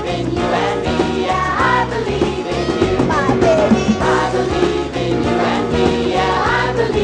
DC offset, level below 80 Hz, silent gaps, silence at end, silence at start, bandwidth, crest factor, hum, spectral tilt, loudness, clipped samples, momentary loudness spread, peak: under 0.1%; -32 dBFS; none; 0 s; 0 s; 10.5 kHz; 14 dB; none; -6 dB/octave; -16 LUFS; under 0.1%; 5 LU; 0 dBFS